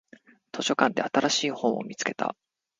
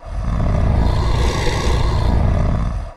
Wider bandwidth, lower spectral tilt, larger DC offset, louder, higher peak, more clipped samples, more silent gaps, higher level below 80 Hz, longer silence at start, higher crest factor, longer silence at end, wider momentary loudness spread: second, 9.6 kHz vs 12 kHz; second, -3 dB/octave vs -6.5 dB/octave; neither; second, -27 LUFS vs -19 LUFS; about the same, -2 dBFS vs -4 dBFS; neither; neither; second, -72 dBFS vs -18 dBFS; first, 0.55 s vs 0 s; first, 26 dB vs 12 dB; first, 0.45 s vs 0 s; first, 9 LU vs 3 LU